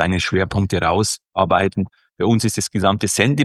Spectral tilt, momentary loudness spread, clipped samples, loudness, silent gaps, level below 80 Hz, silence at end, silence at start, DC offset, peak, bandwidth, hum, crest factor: -4.5 dB/octave; 5 LU; under 0.1%; -18 LUFS; none; -42 dBFS; 0 s; 0 s; under 0.1%; 0 dBFS; 12.5 kHz; none; 18 dB